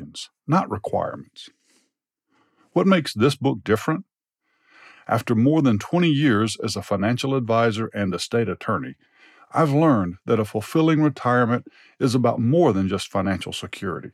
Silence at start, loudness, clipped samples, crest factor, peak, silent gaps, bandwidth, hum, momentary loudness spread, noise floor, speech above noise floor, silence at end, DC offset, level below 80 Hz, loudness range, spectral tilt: 0 s; -22 LUFS; under 0.1%; 16 dB; -6 dBFS; none; 14.5 kHz; none; 10 LU; -75 dBFS; 53 dB; 0.05 s; under 0.1%; -62 dBFS; 3 LU; -6.5 dB/octave